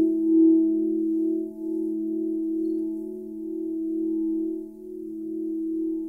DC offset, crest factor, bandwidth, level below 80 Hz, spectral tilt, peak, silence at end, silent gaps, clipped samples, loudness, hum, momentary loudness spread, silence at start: under 0.1%; 14 dB; 0.9 kHz; -66 dBFS; -11 dB/octave; -10 dBFS; 0 s; none; under 0.1%; -26 LUFS; none; 16 LU; 0 s